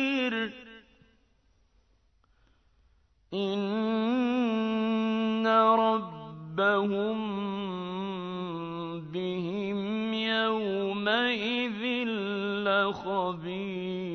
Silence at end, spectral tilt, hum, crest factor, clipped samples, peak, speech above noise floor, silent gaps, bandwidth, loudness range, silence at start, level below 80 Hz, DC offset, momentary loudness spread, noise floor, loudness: 0 s; -6.5 dB/octave; none; 18 dB; under 0.1%; -10 dBFS; 37 dB; none; 6.4 kHz; 8 LU; 0 s; -66 dBFS; under 0.1%; 10 LU; -67 dBFS; -29 LUFS